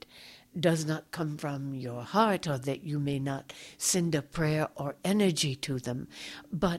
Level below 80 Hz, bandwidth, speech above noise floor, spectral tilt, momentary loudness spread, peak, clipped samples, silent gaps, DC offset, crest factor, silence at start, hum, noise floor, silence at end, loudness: -58 dBFS; 16 kHz; 23 dB; -4.5 dB/octave; 12 LU; -10 dBFS; under 0.1%; none; under 0.1%; 20 dB; 0.15 s; none; -54 dBFS; 0 s; -31 LUFS